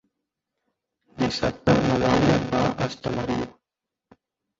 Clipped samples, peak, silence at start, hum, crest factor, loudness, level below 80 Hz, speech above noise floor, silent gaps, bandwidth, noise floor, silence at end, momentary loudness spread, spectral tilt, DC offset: under 0.1%; -6 dBFS; 1.15 s; none; 20 dB; -23 LUFS; -46 dBFS; 64 dB; none; 7.8 kHz; -86 dBFS; 1.1 s; 9 LU; -6.5 dB/octave; under 0.1%